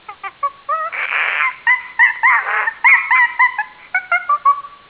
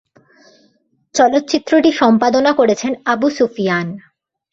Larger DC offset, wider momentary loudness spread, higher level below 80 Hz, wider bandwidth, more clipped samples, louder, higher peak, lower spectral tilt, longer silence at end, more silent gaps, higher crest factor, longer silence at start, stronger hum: neither; first, 13 LU vs 8 LU; second, -66 dBFS vs -58 dBFS; second, 4 kHz vs 7.8 kHz; neither; about the same, -14 LUFS vs -15 LUFS; about the same, -2 dBFS vs -2 dBFS; second, -2 dB/octave vs -4.5 dB/octave; second, 0.15 s vs 0.55 s; neither; about the same, 16 dB vs 14 dB; second, 0.1 s vs 1.15 s; neither